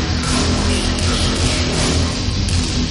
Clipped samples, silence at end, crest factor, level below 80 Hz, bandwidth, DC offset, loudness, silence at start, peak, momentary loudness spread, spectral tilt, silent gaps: under 0.1%; 0 s; 12 dB; -24 dBFS; 11.5 kHz; under 0.1%; -17 LUFS; 0 s; -4 dBFS; 2 LU; -4 dB/octave; none